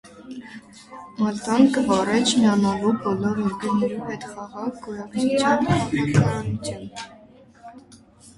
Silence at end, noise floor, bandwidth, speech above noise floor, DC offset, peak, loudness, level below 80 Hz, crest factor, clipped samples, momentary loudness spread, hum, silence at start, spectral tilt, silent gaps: 0.55 s; -49 dBFS; 11.5 kHz; 28 dB; under 0.1%; -4 dBFS; -22 LUFS; -52 dBFS; 18 dB; under 0.1%; 21 LU; none; 0.05 s; -5.5 dB/octave; none